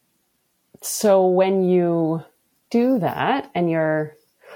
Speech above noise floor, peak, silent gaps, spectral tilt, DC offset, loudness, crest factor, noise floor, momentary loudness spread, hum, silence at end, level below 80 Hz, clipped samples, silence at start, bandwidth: 50 dB; -6 dBFS; none; -6 dB/octave; under 0.1%; -20 LUFS; 16 dB; -69 dBFS; 10 LU; none; 0 s; -68 dBFS; under 0.1%; 0.85 s; 17.5 kHz